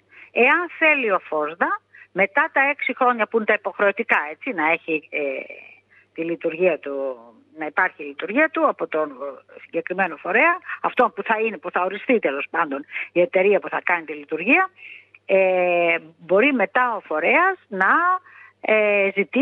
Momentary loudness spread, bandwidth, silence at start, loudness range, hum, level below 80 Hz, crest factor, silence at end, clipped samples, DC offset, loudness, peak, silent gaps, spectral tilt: 12 LU; 4.6 kHz; 0.15 s; 5 LU; none; -82 dBFS; 18 dB; 0 s; under 0.1%; under 0.1%; -20 LUFS; -4 dBFS; none; -7.5 dB/octave